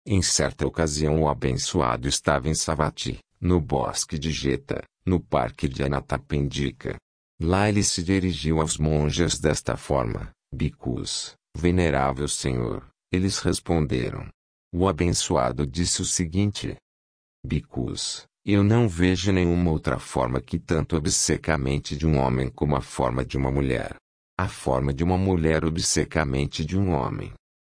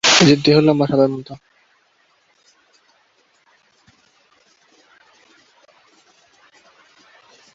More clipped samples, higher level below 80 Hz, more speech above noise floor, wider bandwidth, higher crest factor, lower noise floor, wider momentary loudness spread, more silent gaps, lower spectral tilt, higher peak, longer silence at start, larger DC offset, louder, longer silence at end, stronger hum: neither; first, -38 dBFS vs -58 dBFS; first, over 66 dB vs 46 dB; first, 10.5 kHz vs 7.8 kHz; about the same, 18 dB vs 20 dB; first, under -90 dBFS vs -60 dBFS; second, 9 LU vs 25 LU; first, 7.02-7.38 s, 14.34-14.71 s, 16.82-17.43 s, 24.01-24.37 s vs none; about the same, -5 dB/octave vs -4 dB/octave; second, -6 dBFS vs 0 dBFS; about the same, 0.05 s vs 0.05 s; neither; second, -24 LUFS vs -14 LUFS; second, 0.25 s vs 6.2 s; neither